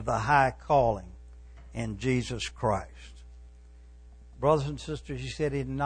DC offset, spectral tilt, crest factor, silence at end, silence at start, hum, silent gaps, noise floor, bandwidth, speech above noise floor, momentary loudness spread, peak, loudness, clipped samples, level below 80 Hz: under 0.1%; -6 dB/octave; 20 dB; 0 s; 0 s; 60 Hz at -45 dBFS; none; -51 dBFS; 10 kHz; 23 dB; 17 LU; -10 dBFS; -29 LUFS; under 0.1%; -46 dBFS